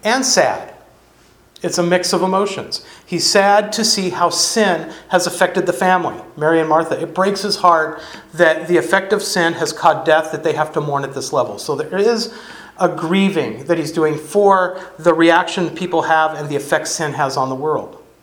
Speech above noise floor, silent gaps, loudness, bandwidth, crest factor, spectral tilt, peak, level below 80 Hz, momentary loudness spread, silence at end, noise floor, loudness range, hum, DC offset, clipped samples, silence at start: 34 dB; none; -16 LUFS; 19 kHz; 16 dB; -3.5 dB/octave; 0 dBFS; -58 dBFS; 10 LU; 0.25 s; -50 dBFS; 3 LU; none; under 0.1%; under 0.1%; 0.05 s